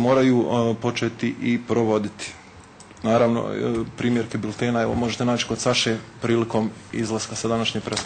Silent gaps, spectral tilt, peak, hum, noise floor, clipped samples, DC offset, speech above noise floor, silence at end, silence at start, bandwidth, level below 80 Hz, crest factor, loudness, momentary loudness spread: none; -5 dB/octave; -8 dBFS; none; -45 dBFS; under 0.1%; under 0.1%; 23 dB; 0 s; 0 s; 9.2 kHz; -52 dBFS; 14 dB; -23 LUFS; 8 LU